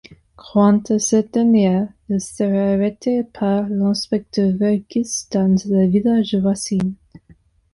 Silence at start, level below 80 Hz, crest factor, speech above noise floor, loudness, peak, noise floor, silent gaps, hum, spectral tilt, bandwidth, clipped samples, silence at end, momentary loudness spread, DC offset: 0.1 s; -52 dBFS; 14 dB; 35 dB; -18 LUFS; -4 dBFS; -52 dBFS; none; none; -6 dB/octave; 11.5 kHz; under 0.1%; 0.8 s; 7 LU; under 0.1%